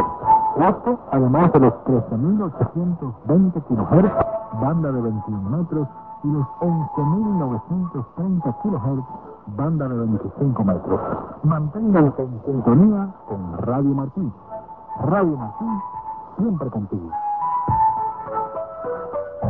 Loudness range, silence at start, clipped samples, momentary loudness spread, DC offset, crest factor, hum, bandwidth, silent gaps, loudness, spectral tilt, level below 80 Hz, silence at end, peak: 5 LU; 0 s; under 0.1%; 12 LU; 0.2%; 18 dB; none; 3.3 kHz; none; -21 LUFS; -13.5 dB/octave; -46 dBFS; 0 s; -2 dBFS